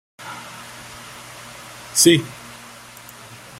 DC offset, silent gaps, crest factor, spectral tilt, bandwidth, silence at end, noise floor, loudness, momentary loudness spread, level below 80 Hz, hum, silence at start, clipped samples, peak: under 0.1%; none; 24 dB; -3 dB/octave; 16 kHz; 1.25 s; -41 dBFS; -15 LUFS; 25 LU; -60 dBFS; none; 0.2 s; under 0.1%; 0 dBFS